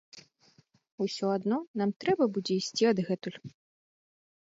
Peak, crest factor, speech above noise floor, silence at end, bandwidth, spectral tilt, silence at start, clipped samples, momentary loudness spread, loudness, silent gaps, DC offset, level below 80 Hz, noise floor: -14 dBFS; 18 dB; 35 dB; 0.9 s; 7.8 kHz; -5.5 dB/octave; 0.15 s; under 0.1%; 10 LU; -30 LUFS; 0.92-0.98 s, 1.67-1.74 s, 1.96-2.00 s; under 0.1%; -76 dBFS; -65 dBFS